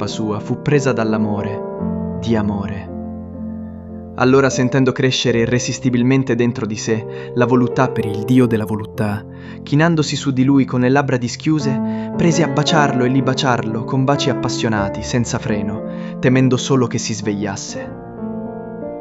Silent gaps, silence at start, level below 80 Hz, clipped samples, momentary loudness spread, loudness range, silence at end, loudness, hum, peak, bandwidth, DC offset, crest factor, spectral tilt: none; 0 s; -46 dBFS; under 0.1%; 14 LU; 4 LU; 0 s; -17 LUFS; none; 0 dBFS; 12 kHz; under 0.1%; 18 dB; -5.5 dB/octave